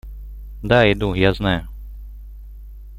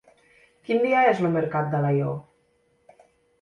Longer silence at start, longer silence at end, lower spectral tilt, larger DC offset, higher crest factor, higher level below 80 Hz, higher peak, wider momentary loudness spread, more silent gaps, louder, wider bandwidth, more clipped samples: second, 0.05 s vs 0.7 s; second, 0 s vs 1.2 s; about the same, -7.5 dB/octave vs -8.5 dB/octave; neither; about the same, 20 dB vs 18 dB; first, -34 dBFS vs -64 dBFS; first, -2 dBFS vs -6 dBFS; first, 25 LU vs 12 LU; neither; first, -18 LUFS vs -23 LUFS; first, 15.5 kHz vs 9.8 kHz; neither